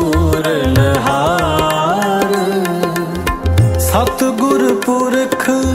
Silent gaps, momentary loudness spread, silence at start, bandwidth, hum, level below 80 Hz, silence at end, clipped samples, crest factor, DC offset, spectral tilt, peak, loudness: none; 4 LU; 0 s; 16.5 kHz; none; -28 dBFS; 0 s; under 0.1%; 14 dB; under 0.1%; -5.5 dB/octave; 0 dBFS; -14 LUFS